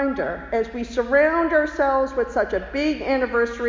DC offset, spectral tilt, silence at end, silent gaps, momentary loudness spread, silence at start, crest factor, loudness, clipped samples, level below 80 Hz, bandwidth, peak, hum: under 0.1%; -5.5 dB/octave; 0 s; none; 7 LU; 0 s; 14 dB; -22 LUFS; under 0.1%; -42 dBFS; 7.6 kHz; -6 dBFS; none